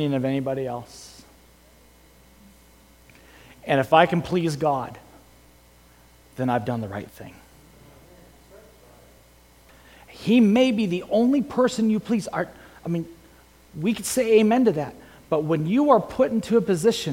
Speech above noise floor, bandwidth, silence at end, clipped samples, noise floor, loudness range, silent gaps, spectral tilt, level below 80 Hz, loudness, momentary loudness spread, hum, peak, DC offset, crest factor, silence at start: 32 dB; 17 kHz; 0 s; under 0.1%; -53 dBFS; 11 LU; none; -6 dB/octave; -56 dBFS; -22 LUFS; 19 LU; none; -2 dBFS; under 0.1%; 22 dB; 0 s